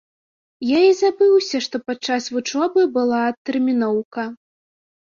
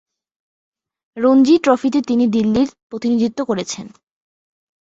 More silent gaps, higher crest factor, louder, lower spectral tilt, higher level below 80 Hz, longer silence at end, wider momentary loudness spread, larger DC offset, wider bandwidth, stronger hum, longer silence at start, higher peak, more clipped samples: first, 3.38-3.45 s, 4.05-4.11 s vs 2.83-2.90 s; about the same, 16 dB vs 16 dB; second, -19 LUFS vs -16 LUFS; second, -4 dB/octave vs -5.5 dB/octave; second, -66 dBFS vs -54 dBFS; second, 0.75 s vs 1 s; about the same, 10 LU vs 11 LU; neither; about the same, 7.4 kHz vs 8 kHz; neither; second, 0.6 s vs 1.15 s; about the same, -4 dBFS vs -2 dBFS; neither